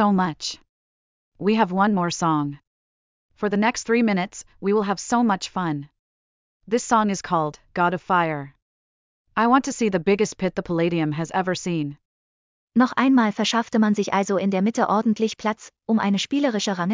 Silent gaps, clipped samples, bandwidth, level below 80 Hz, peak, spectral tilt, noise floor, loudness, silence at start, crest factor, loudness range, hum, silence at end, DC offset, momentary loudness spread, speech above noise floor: 0.69-1.32 s, 2.67-3.29 s, 5.99-6.60 s, 8.62-9.25 s, 12.05-12.68 s; under 0.1%; 7.6 kHz; -60 dBFS; -6 dBFS; -5 dB/octave; under -90 dBFS; -22 LUFS; 0 s; 16 dB; 3 LU; none; 0 s; under 0.1%; 9 LU; over 69 dB